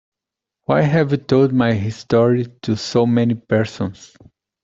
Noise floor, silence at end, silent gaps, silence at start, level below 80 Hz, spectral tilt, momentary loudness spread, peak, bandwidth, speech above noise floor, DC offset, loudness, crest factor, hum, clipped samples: -85 dBFS; 0.6 s; none; 0.7 s; -52 dBFS; -7.5 dB/octave; 8 LU; -2 dBFS; 7.8 kHz; 68 dB; under 0.1%; -18 LUFS; 16 dB; none; under 0.1%